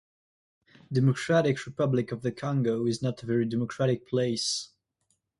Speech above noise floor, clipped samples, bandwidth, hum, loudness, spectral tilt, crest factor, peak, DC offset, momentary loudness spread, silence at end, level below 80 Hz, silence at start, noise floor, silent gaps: 48 dB; under 0.1%; 11.5 kHz; none; -28 LUFS; -6 dB/octave; 18 dB; -12 dBFS; under 0.1%; 7 LU; 0.75 s; -66 dBFS; 0.9 s; -76 dBFS; none